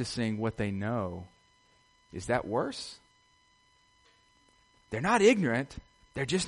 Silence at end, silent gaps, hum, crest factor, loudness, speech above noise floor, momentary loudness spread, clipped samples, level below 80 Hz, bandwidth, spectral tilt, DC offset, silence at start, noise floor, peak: 0 s; none; none; 24 dB; -30 LUFS; 37 dB; 20 LU; under 0.1%; -58 dBFS; 11.5 kHz; -5 dB/octave; under 0.1%; 0 s; -66 dBFS; -10 dBFS